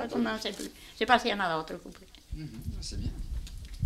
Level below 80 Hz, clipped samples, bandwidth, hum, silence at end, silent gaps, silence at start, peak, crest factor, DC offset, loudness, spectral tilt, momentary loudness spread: -42 dBFS; under 0.1%; 16 kHz; none; 0 s; none; 0 s; -6 dBFS; 26 dB; under 0.1%; -32 LUFS; -4.5 dB/octave; 19 LU